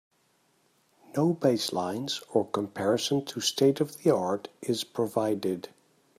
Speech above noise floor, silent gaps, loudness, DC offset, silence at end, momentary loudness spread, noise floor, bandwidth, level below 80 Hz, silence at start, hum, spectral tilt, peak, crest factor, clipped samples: 41 dB; none; -28 LUFS; under 0.1%; 0.5 s; 8 LU; -69 dBFS; 16 kHz; -74 dBFS; 1.15 s; none; -5 dB/octave; -10 dBFS; 20 dB; under 0.1%